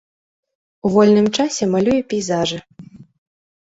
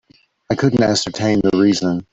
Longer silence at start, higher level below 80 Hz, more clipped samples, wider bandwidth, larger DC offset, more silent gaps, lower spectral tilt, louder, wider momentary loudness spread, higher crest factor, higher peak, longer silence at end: first, 0.85 s vs 0.5 s; second, -54 dBFS vs -48 dBFS; neither; about the same, 8 kHz vs 8.4 kHz; neither; neither; about the same, -5 dB/octave vs -5.5 dB/octave; about the same, -17 LUFS vs -16 LUFS; first, 10 LU vs 4 LU; about the same, 16 dB vs 14 dB; about the same, -2 dBFS vs -2 dBFS; first, 0.6 s vs 0.1 s